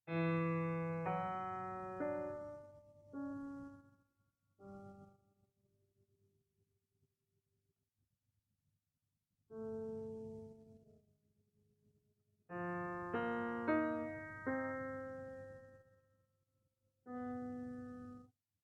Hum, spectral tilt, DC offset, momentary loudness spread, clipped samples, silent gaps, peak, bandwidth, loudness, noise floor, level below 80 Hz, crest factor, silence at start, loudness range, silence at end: none; -9 dB/octave; under 0.1%; 21 LU; under 0.1%; none; -24 dBFS; 7.2 kHz; -43 LUFS; -89 dBFS; -76 dBFS; 22 dB; 0.05 s; 18 LU; 0.35 s